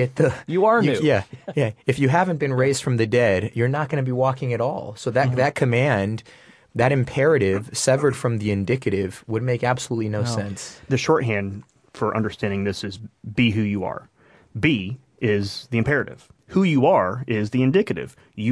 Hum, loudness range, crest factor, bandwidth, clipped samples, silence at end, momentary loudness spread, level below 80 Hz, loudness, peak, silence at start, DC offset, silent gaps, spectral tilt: none; 4 LU; 18 dB; 11 kHz; under 0.1%; 0 s; 10 LU; -54 dBFS; -22 LUFS; -2 dBFS; 0 s; under 0.1%; none; -6 dB/octave